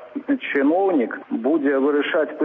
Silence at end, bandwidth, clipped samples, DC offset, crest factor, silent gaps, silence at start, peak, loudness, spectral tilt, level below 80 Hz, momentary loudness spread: 0 s; 3.9 kHz; under 0.1%; under 0.1%; 12 dB; none; 0 s; -8 dBFS; -21 LUFS; -7.5 dB/octave; -74 dBFS; 7 LU